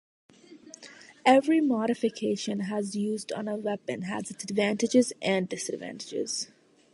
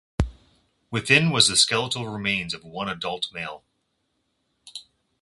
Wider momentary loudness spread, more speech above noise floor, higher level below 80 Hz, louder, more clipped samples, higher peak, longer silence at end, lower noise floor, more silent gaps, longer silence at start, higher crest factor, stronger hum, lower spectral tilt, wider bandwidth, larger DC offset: second, 15 LU vs 22 LU; second, 23 dB vs 50 dB; second, -74 dBFS vs -42 dBFS; second, -28 LUFS vs -22 LUFS; neither; second, -8 dBFS vs -2 dBFS; about the same, 0.5 s vs 0.4 s; second, -51 dBFS vs -74 dBFS; neither; first, 0.5 s vs 0.2 s; about the same, 22 dB vs 26 dB; neither; first, -4.5 dB/octave vs -2.5 dB/octave; about the same, 11.5 kHz vs 11.5 kHz; neither